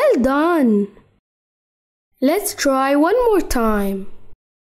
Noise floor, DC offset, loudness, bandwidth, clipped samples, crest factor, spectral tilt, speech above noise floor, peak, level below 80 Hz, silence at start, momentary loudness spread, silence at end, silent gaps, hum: under -90 dBFS; under 0.1%; -17 LUFS; 16 kHz; under 0.1%; 14 dB; -5 dB/octave; over 74 dB; -6 dBFS; -36 dBFS; 0 s; 7 LU; 0.4 s; 1.19-2.11 s; none